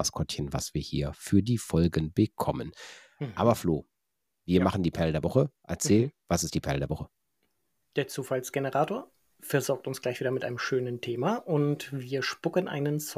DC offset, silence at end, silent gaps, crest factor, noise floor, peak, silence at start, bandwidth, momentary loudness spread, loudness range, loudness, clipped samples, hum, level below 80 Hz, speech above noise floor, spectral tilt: under 0.1%; 0 s; none; 20 dB; -84 dBFS; -8 dBFS; 0 s; 16 kHz; 9 LU; 4 LU; -29 LUFS; under 0.1%; none; -50 dBFS; 55 dB; -5.5 dB/octave